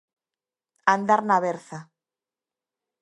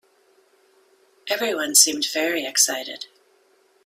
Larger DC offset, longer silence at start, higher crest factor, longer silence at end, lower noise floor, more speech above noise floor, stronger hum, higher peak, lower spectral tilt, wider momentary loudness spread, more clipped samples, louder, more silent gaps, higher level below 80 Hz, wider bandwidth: neither; second, 0.85 s vs 1.25 s; about the same, 24 dB vs 24 dB; first, 1.2 s vs 0.8 s; first, under -90 dBFS vs -61 dBFS; first, over 68 dB vs 39 dB; neither; about the same, -2 dBFS vs 0 dBFS; first, -5.5 dB/octave vs 1 dB/octave; about the same, 20 LU vs 21 LU; neither; second, -22 LUFS vs -19 LUFS; neither; about the same, -78 dBFS vs -76 dBFS; second, 11.5 kHz vs 16 kHz